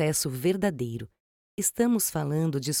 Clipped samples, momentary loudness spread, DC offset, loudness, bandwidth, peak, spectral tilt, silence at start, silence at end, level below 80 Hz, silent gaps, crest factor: under 0.1%; 14 LU; under 0.1%; -27 LUFS; over 20 kHz; -12 dBFS; -4.5 dB/octave; 0 s; 0 s; -60 dBFS; 1.20-1.58 s; 16 dB